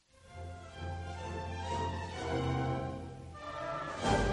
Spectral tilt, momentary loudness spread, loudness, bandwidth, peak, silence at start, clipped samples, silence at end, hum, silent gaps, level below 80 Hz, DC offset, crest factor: -5.5 dB/octave; 13 LU; -38 LUFS; 11 kHz; -16 dBFS; 0.2 s; under 0.1%; 0 s; none; none; -50 dBFS; under 0.1%; 20 dB